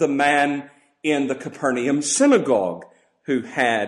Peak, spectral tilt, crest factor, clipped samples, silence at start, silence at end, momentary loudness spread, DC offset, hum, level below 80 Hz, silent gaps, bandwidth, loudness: -6 dBFS; -3.5 dB/octave; 16 dB; under 0.1%; 0 s; 0 s; 12 LU; under 0.1%; none; -68 dBFS; none; 11.5 kHz; -20 LUFS